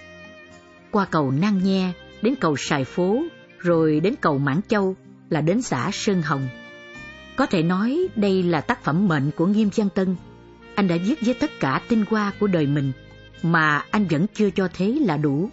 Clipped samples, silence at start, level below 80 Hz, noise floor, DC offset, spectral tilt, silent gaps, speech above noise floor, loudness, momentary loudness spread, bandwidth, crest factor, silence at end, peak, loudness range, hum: under 0.1%; 0 s; -54 dBFS; -47 dBFS; under 0.1%; -6.5 dB/octave; none; 26 dB; -22 LUFS; 9 LU; 8 kHz; 16 dB; 0 s; -6 dBFS; 2 LU; none